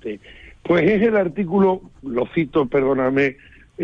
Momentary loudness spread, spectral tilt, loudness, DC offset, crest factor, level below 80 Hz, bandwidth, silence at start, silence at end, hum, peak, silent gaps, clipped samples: 11 LU; -8.5 dB/octave; -19 LUFS; under 0.1%; 14 dB; -48 dBFS; 6.8 kHz; 0.05 s; 0 s; none; -6 dBFS; none; under 0.1%